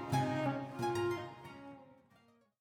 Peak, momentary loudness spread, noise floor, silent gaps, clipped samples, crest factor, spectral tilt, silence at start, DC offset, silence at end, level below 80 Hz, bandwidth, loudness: -22 dBFS; 18 LU; -69 dBFS; none; under 0.1%; 16 dB; -6.5 dB/octave; 0 s; under 0.1%; 0.65 s; -72 dBFS; 18 kHz; -37 LUFS